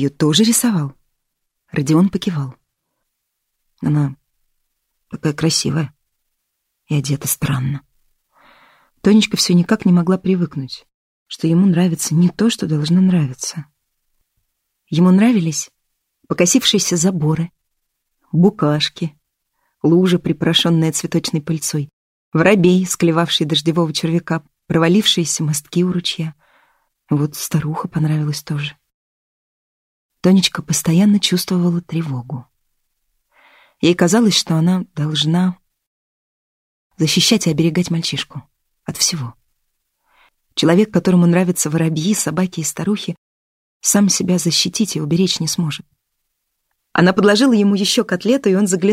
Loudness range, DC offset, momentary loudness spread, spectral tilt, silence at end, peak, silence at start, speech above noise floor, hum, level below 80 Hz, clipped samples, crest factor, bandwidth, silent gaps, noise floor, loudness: 6 LU; under 0.1%; 12 LU; -4.5 dB/octave; 0 s; 0 dBFS; 0 s; 59 dB; none; -54 dBFS; under 0.1%; 18 dB; 16 kHz; 10.94-11.26 s, 21.93-22.32 s, 28.94-30.09 s, 35.87-36.90 s, 43.18-43.80 s; -74 dBFS; -16 LUFS